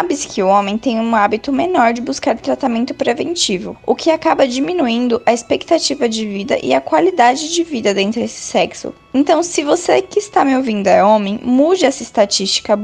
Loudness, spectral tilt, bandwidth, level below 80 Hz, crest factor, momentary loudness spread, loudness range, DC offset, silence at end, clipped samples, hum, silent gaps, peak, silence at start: -15 LUFS; -3.5 dB/octave; 10 kHz; -52 dBFS; 14 dB; 6 LU; 2 LU; under 0.1%; 0 s; under 0.1%; none; none; 0 dBFS; 0 s